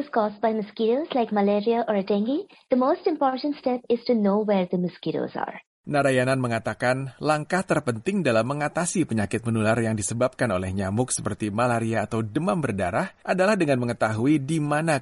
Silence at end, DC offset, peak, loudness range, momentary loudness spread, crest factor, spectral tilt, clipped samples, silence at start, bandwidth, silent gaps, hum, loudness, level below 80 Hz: 0 s; under 0.1%; -8 dBFS; 1 LU; 5 LU; 16 dB; -5.5 dB/octave; under 0.1%; 0 s; 11.5 kHz; 5.67-5.84 s; none; -24 LUFS; -58 dBFS